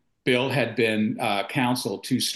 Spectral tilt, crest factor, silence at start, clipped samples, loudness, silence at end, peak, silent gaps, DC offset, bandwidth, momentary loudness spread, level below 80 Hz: -4.5 dB/octave; 16 dB; 0.25 s; under 0.1%; -24 LUFS; 0 s; -10 dBFS; none; under 0.1%; 12.5 kHz; 4 LU; -68 dBFS